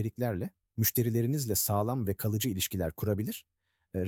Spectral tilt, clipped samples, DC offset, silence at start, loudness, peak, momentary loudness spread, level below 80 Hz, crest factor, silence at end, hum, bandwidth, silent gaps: -5 dB/octave; under 0.1%; under 0.1%; 0 s; -31 LUFS; -16 dBFS; 10 LU; -56 dBFS; 16 dB; 0 s; none; 18.5 kHz; none